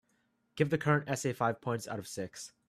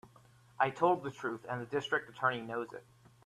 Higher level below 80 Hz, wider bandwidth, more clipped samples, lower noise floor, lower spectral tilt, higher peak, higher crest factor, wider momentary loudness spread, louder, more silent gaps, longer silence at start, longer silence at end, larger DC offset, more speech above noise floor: first, -70 dBFS vs -76 dBFS; about the same, 14 kHz vs 13 kHz; neither; first, -75 dBFS vs -62 dBFS; about the same, -5.5 dB/octave vs -5.5 dB/octave; about the same, -14 dBFS vs -14 dBFS; about the same, 20 dB vs 22 dB; about the same, 11 LU vs 10 LU; about the same, -33 LUFS vs -35 LUFS; neither; first, 0.55 s vs 0.05 s; second, 0.2 s vs 0.45 s; neither; first, 42 dB vs 27 dB